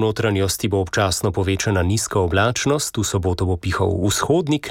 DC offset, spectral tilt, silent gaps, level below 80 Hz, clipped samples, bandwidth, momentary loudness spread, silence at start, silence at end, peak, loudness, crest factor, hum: under 0.1%; -4.5 dB/octave; none; -40 dBFS; under 0.1%; 16.5 kHz; 3 LU; 0 s; 0 s; -6 dBFS; -20 LUFS; 14 dB; none